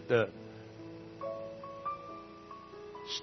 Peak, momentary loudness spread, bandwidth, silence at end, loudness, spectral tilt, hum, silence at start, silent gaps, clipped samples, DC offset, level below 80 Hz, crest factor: -14 dBFS; 15 LU; 6.2 kHz; 0 s; -40 LUFS; -3.5 dB/octave; 60 Hz at -65 dBFS; 0 s; none; under 0.1%; under 0.1%; -70 dBFS; 26 dB